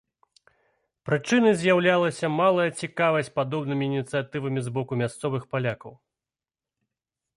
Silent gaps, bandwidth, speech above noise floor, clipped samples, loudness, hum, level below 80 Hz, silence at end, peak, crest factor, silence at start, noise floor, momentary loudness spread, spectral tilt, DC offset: none; 11.5 kHz; over 66 dB; under 0.1%; -25 LUFS; none; -66 dBFS; 1.45 s; -8 dBFS; 18 dB; 1.05 s; under -90 dBFS; 9 LU; -6 dB/octave; under 0.1%